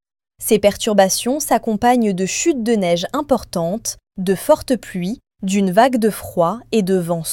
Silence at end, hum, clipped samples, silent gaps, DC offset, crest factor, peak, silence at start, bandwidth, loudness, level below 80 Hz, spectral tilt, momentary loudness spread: 0 s; none; under 0.1%; none; under 0.1%; 16 dB; -2 dBFS; 0.4 s; 17.5 kHz; -18 LUFS; -48 dBFS; -4.5 dB/octave; 10 LU